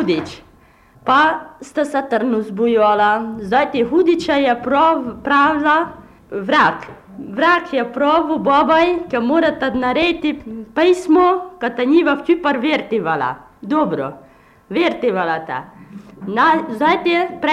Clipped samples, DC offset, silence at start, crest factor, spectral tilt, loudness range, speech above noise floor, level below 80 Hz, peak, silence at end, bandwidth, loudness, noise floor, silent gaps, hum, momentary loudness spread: under 0.1%; under 0.1%; 0 s; 12 dB; -5.5 dB/octave; 4 LU; 33 dB; -50 dBFS; -4 dBFS; 0 s; 11 kHz; -16 LUFS; -49 dBFS; none; none; 13 LU